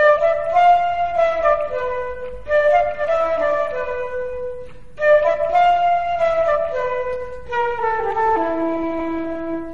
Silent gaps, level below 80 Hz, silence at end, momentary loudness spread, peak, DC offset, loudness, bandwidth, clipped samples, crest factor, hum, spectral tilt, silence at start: none; -44 dBFS; 0 s; 11 LU; -4 dBFS; 2%; -19 LUFS; 7.2 kHz; under 0.1%; 16 dB; none; -5.5 dB/octave; 0 s